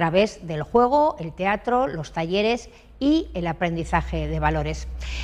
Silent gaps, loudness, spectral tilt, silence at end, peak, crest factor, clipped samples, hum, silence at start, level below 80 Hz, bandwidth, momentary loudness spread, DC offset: none; -23 LUFS; -6 dB/octave; 0 s; -6 dBFS; 16 dB; under 0.1%; none; 0 s; -36 dBFS; 10.5 kHz; 9 LU; under 0.1%